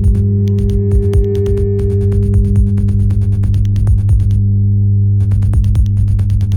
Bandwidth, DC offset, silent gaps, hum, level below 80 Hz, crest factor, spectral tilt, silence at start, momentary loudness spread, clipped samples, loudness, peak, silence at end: 9.8 kHz; under 0.1%; none; 50 Hz at -15 dBFS; -16 dBFS; 8 dB; -10 dB/octave; 0 s; 2 LU; under 0.1%; -13 LUFS; -2 dBFS; 0 s